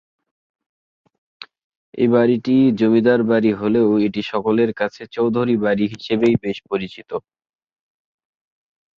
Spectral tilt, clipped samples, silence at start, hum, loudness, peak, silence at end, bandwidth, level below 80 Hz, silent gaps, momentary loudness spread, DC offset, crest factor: -8 dB/octave; under 0.1%; 1.4 s; none; -18 LUFS; -2 dBFS; 1.8 s; 7 kHz; -58 dBFS; 1.64-1.93 s; 10 LU; under 0.1%; 16 dB